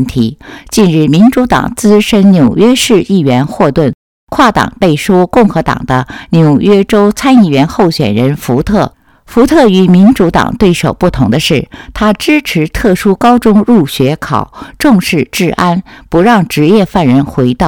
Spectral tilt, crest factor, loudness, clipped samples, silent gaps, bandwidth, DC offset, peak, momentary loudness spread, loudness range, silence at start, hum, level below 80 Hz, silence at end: -6 dB/octave; 8 dB; -8 LUFS; 2%; 3.95-4.27 s; 18 kHz; 0.5%; 0 dBFS; 8 LU; 2 LU; 0 s; none; -30 dBFS; 0 s